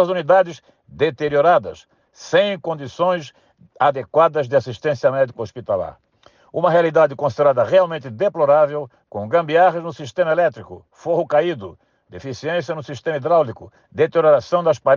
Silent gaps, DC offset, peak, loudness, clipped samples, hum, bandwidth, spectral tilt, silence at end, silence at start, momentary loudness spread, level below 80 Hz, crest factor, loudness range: none; under 0.1%; -4 dBFS; -18 LUFS; under 0.1%; none; 7.2 kHz; -6 dB/octave; 0 s; 0 s; 14 LU; -62 dBFS; 16 dB; 5 LU